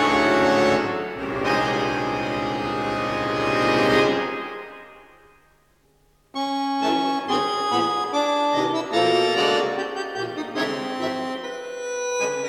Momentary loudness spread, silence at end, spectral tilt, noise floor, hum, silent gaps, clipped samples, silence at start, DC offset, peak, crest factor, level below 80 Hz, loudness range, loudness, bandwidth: 11 LU; 0 s; -4 dB/octave; -61 dBFS; none; none; under 0.1%; 0 s; under 0.1%; -6 dBFS; 18 dB; -54 dBFS; 4 LU; -22 LUFS; 16 kHz